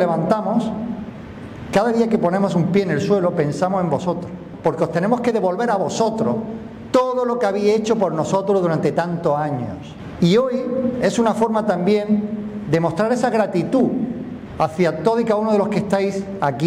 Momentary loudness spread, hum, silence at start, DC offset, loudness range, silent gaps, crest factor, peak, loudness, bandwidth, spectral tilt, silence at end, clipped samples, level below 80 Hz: 9 LU; none; 0 s; under 0.1%; 1 LU; none; 14 dB; -6 dBFS; -19 LUFS; 13 kHz; -7 dB/octave; 0 s; under 0.1%; -52 dBFS